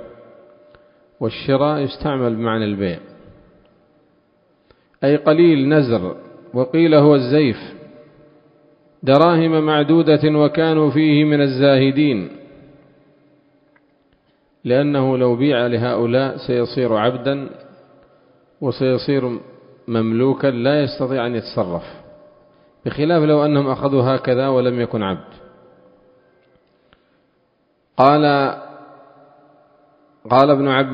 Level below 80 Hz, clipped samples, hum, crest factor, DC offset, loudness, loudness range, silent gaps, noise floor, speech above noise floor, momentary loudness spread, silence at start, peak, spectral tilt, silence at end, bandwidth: -54 dBFS; under 0.1%; none; 18 dB; under 0.1%; -17 LUFS; 7 LU; none; -63 dBFS; 47 dB; 13 LU; 0 s; 0 dBFS; -10 dB/octave; 0 s; 5.4 kHz